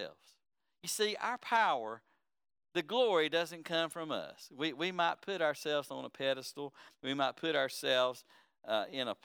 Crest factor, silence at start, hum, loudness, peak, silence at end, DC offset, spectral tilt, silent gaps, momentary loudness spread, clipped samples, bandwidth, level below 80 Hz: 18 dB; 0 s; none; -35 LUFS; -18 dBFS; 0.1 s; under 0.1%; -3 dB/octave; none; 14 LU; under 0.1%; over 20 kHz; under -90 dBFS